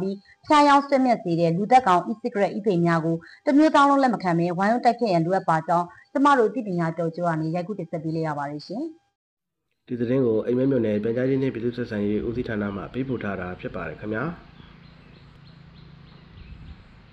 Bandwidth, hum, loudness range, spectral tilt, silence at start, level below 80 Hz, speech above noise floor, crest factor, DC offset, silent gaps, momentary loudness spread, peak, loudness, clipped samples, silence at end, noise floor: 9.8 kHz; none; 12 LU; -7 dB/octave; 0 s; -54 dBFS; 52 dB; 16 dB; under 0.1%; 9.15-9.37 s; 14 LU; -8 dBFS; -23 LUFS; under 0.1%; 0.4 s; -74 dBFS